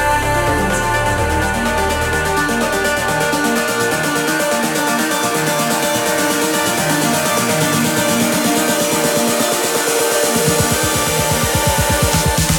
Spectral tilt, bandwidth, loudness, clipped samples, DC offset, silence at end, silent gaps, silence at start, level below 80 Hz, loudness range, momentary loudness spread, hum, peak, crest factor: -3 dB/octave; 19.5 kHz; -15 LUFS; under 0.1%; under 0.1%; 0 s; none; 0 s; -32 dBFS; 2 LU; 2 LU; none; -2 dBFS; 14 dB